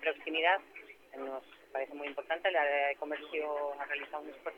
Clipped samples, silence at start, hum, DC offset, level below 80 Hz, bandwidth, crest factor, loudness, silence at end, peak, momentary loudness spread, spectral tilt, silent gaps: under 0.1%; 0 s; none; under 0.1%; -80 dBFS; 15.5 kHz; 20 dB; -34 LUFS; 0 s; -16 dBFS; 15 LU; -2.5 dB/octave; none